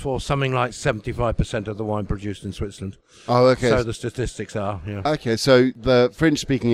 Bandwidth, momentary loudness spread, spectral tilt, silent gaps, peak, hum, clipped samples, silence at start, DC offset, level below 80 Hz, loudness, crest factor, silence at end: 14.5 kHz; 14 LU; -6 dB/octave; none; -4 dBFS; none; under 0.1%; 0 s; under 0.1%; -38 dBFS; -22 LUFS; 18 dB; 0 s